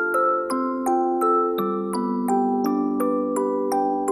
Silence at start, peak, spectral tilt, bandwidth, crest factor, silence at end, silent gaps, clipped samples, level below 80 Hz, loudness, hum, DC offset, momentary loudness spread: 0 s; -10 dBFS; -6 dB/octave; 15.5 kHz; 12 dB; 0 s; none; under 0.1%; -64 dBFS; -22 LUFS; none; under 0.1%; 5 LU